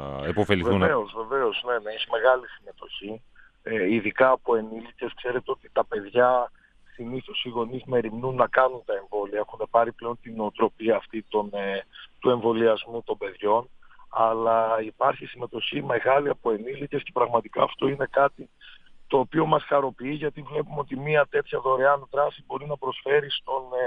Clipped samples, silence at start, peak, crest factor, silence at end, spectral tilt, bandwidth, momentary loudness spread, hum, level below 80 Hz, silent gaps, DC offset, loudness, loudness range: under 0.1%; 0 s; -4 dBFS; 22 dB; 0 s; -7.5 dB/octave; 8.2 kHz; 12 LU; none; -58 dBFS; none; under 0.1%; -25 LUFS; 2 LU